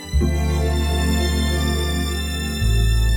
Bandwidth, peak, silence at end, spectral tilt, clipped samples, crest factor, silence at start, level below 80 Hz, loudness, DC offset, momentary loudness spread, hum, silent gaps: over 20 kHz; -8 dBFS; 0 s; -5 dB/octave; under 0.1%; 12 dB; 0 s; -20 dBFS; -21 LUFS; under 0.1%; 4 LU; none; none